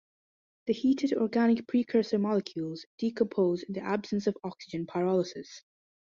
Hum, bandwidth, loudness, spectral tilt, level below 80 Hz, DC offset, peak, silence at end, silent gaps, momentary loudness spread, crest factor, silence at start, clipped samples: none; 7.4 kHz; -30 LUFS; -7 dB/octave; -72 dBFS; under 0.1%; -14 dBFS; 0.45 s; 2.86-2.98 s; 12 LU; 16 dB; 0.65 s; under 0.1%